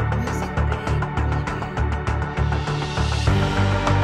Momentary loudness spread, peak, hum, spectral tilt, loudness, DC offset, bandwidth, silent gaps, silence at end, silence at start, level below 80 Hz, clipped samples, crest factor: 5 LU; -6 dBFS; none; -6.5 dB/octave; -23 LUFS; under 0.1%; 12 kHz; none; 0 s; 0 s; -28 dBFS; under 0.1%; 16 dB